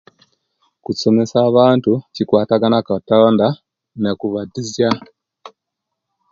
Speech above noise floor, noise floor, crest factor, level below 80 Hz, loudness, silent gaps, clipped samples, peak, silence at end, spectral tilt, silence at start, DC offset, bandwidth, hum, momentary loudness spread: 64 dB; -79 dBFS; 16 dB; -56 dBFS; -16 LUFS; none; under 0.1%; 0 dBFS; 0.85 s; -6.5 dB/octave; 0.9 s; under 0.1%; 7.6 kHz; none; 12 LU